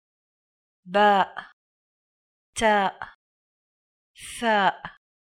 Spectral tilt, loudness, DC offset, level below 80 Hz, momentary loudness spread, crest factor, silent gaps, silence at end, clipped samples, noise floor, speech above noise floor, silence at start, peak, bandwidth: -3.5 dB/octave; -23 LUFS; under 0.1%; -60 dBFS; 22 LU; 22 dB; 1.53-2.53 s, 3.15-4.14 s; 0.5 s; under 0.1%; under -90 dBFS; over 67 dB; 0.85 s; -6 dBFS; 14.5 kHz